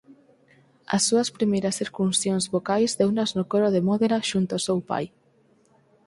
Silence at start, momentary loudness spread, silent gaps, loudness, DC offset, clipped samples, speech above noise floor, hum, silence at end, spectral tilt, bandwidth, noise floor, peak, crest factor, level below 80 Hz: 0.1 s; 6 LU; none; -24 LUFS; under 0.1%; under 0.1%; 38 dB; none; 1 s; -4.5 dB/octave; 11.5 kHz; -61 dBFS; -8 dBFS; 16 dB; -64 dBFS